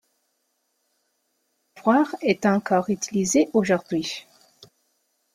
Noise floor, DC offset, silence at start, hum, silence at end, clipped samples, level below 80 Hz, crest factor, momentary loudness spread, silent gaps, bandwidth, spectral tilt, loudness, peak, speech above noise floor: -73 dBFS; under 0.1%; 1.75 s; none; 1.15 s; under 0.1%; -66 dBFS; 20 dB; 8 LU; none; 15.5 kHz; -4.5 dB/octave; -22 LUFS; -4 dBFS; 51 dB